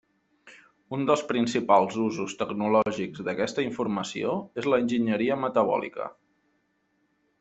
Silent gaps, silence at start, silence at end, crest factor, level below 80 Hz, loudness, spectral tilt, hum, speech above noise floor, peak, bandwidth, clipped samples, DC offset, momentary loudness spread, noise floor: none; 0.45 s; 1.3 s; 20 dB; -68 dBFS; -26 LUFS; -5.5 dB/octave; none; 46 dB; -6 dBFS; 8.2 kHz; under 0.1%; under 0.1%; 9 LU; -72 dBFS